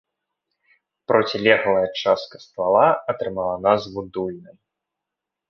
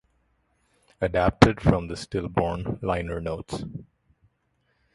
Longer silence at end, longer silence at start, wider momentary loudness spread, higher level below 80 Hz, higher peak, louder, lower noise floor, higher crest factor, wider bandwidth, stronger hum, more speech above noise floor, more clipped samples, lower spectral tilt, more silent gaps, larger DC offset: about the same, 1.05 s vs 1.1 s; about the same, 1.1 s vs 1 s; about the same, 14 LU vs 16 LU; second, -58 dBFS vs -40 dBFS; about the same, -2 dBFS vs 0 dBFS; first, -20 LUFS vs -25 LUFS; first, -84 dBFS vs -71 dBFS; second, 20 dB vs 26 dB; second, 6.6 kHz vs 11.5 kHz; neither; first, 64 dB vs 47 dB; neither; second, -5.5 dB/octave vs -7 dB/octave; neither; neither